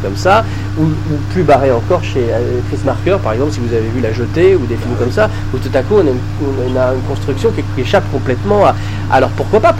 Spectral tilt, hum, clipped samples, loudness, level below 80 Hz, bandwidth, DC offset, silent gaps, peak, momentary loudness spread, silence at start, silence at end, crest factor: -7 dB/octave; none; under 0.1%; -14 LUFS; -26 dBFS; 12 kHz; 0.2%; none; 0 dBFS; 7 LU; 0 s; 0 s; 12 dB